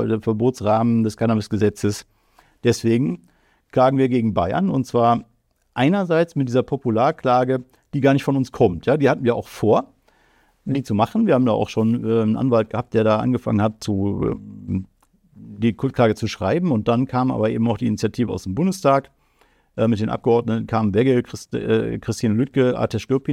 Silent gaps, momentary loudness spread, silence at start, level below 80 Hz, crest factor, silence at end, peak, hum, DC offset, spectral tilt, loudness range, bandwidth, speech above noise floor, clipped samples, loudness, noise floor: none; 7 LU; 0 s; -52 dBFS; 16 dB; 0 s; -4 dBFS; none; under 0.1%; -7.5 dB/octave; 3 LU; 14 kHz; 40 dB; under 0.1%; -20 LUFS; -60 dBFS